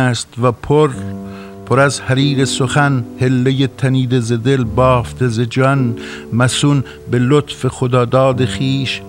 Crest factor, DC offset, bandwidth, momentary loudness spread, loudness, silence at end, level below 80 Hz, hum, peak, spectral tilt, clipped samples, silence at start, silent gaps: 14 dB; under 0.1%; 12 kHz; 7 LU; -15 LUFS; 0 s; -40 dBFS; none; 0 dBFS; -6 dB/octave; under 0.1%; 0 s; none